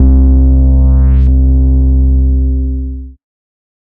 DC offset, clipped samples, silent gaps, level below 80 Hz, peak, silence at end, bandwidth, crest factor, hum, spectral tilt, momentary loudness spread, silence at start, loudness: under 0.1%; under 0.1%; none; -8 dBFS; -2 dBFS; 0.8 s; 1.5 kHz; 8 dB; none; -13.5 dB/octave; 10 LU; 0 s; -10 LUFS